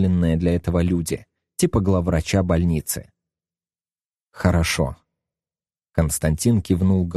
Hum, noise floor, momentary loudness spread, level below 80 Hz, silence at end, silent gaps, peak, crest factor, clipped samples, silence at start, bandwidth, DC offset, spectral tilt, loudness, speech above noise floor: none; under -90 dBFS; 9 LU; -36 dBFS; 0 s; 4.05-4.13 s, 4.22-4.27 s; -2 dBFS; 20 dB; under 0.1%; 0 s; 13 kHz; under 0.1%; -6 dB/octave; -21 LUFS; over 70 dB